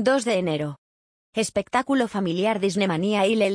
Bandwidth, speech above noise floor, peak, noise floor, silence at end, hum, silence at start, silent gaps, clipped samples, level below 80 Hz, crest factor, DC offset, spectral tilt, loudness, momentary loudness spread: 10.5 kHz; over 68 dB; -6 dBFS; under -90 dBFS; 0 s; none; 0 s; 0.78-1.33 s; under 0.1%; -62 dBFS; 16 dB; under 0.1%; -5 dB/octave; -24 LUFS; 7 LU